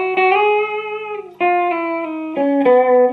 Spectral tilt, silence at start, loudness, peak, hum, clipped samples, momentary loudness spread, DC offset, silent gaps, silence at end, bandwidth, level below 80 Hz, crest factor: -6.5 dB/octave; 0 s; -16 LUFS; -2 dBFS; 50 Hz at -55 dBFS; under 0.1%; 12 LU; under 0.1%; none; 0 s; 4.6 kHz; -68 dBFS; 14 dB